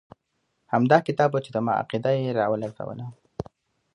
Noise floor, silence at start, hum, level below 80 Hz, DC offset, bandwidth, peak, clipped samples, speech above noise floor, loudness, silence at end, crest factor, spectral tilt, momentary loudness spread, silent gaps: -75 dBFS; 0.7 s; none; -62 dBFS; under 0.1%; 10.5 kHz; -4 dBFS; under 0.1%; 51 dB; -24 LUFS; 0.55 s; 22 dB; -7.5 dB/octave; 19 LU; none